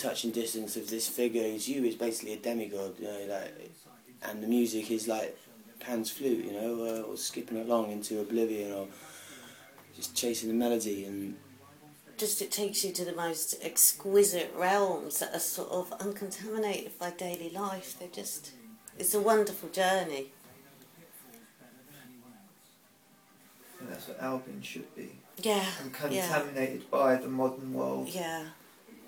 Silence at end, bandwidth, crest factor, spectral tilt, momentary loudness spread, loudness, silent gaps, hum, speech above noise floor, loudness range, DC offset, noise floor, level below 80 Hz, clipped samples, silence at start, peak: 0 s; 19 kHz; 24 dB; -3 dB/octave; 19 LU; -32 LUFS; none; none; 30 dB; 9 LU; under 0.1%; -62 dBFS; -80 dBFS; under 0.1%; 0 s; -10 dBFS